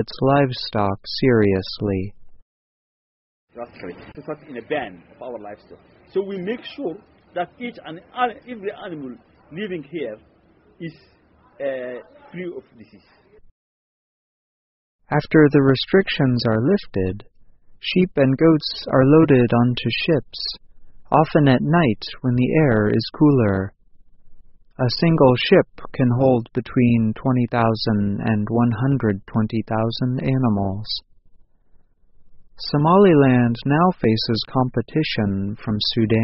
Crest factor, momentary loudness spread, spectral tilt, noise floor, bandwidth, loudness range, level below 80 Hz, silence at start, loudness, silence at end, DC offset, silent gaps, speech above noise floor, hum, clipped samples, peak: 20 dB; 19 LU; -5.5 dB/octave; -52 dBFS; 6 kHz; 15 LU; -48 dBFS; 0 s; -19 LUFS; 0 s; under 0.1%; 2.42-3.48 s, 13.51-14.99 s; 33 dB; none; under 0.1%; -2 dBFS